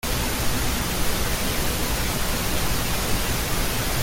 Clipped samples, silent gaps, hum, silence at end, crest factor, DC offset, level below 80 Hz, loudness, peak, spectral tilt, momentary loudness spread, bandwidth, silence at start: under 0.1%; none; none; 0 s; 14 dB; under 0.1%; -30 dBFS; -24 LUFS; -10 dBFS; -3 dB/octave; 0 LU; 17 kHz; 0.05 s